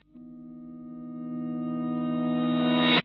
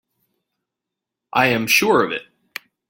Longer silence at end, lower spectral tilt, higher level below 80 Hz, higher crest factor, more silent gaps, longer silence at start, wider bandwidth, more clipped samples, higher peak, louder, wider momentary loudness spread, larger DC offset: second, 0 s vs 0.65 s; about the same, -3.5 dB/octave vs -3.5 dB/octave; second, -72 dBFS vs -60 dBFS; about the same, 18 dB vs 20 dB; neither; second, 0.15 s vs 1.35 s; second, 5.4 kHz vs 17 kHz; neither; second, -10 dBFS vs -2 dBFS; second, -28 LUFS vs -17 LUFS; about the same, 21 LU vs 21 LU; neither